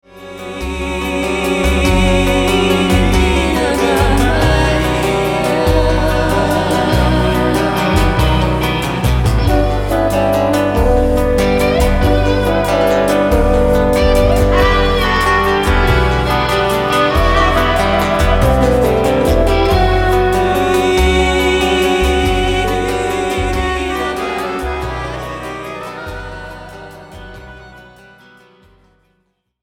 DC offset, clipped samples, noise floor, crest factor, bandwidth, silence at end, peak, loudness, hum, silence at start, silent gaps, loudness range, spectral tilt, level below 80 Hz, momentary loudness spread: under 0.1%; under 0.1%; -64 dBFS; 12 dB; 17.5 kHz; 1.8 s; 0 dBFS; -14 LUFS; none; 0.15 s; none; 8 LU; -5.5 dB/octave; -20 dBFS; 11 LU